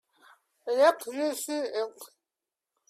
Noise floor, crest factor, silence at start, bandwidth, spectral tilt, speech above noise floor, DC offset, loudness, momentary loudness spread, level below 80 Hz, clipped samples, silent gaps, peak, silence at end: -89 dBFS; 20 dB; 0.65 s; 16 kHz; -1 dB/octave; 62 dB; under 0.1%; -28 LUFS; 16 LU; -84 dBFS; under 0.1%; none; -10 dBFS; 0.85 s